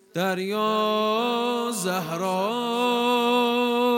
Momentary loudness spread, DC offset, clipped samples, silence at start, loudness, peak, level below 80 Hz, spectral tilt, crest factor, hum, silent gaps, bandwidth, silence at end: 5 LU; under 0.1%; under 0.1%; 0.15 s; -24 LUFS; -8 dBFS; -80 dBFS; -4 dB/octave; 14 dB; none; none; 16.5 kHz; 0 s